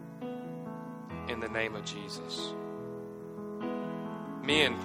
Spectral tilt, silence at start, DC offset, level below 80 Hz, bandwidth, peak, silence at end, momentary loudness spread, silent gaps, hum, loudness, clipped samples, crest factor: -4 dB/octave; 0 s; under 0.1%; -64 dBFS; 16 kHz; -12 dBFS; 0 s; 13 LU; none; none; -36 LUFS; under 0.1%; 24 dB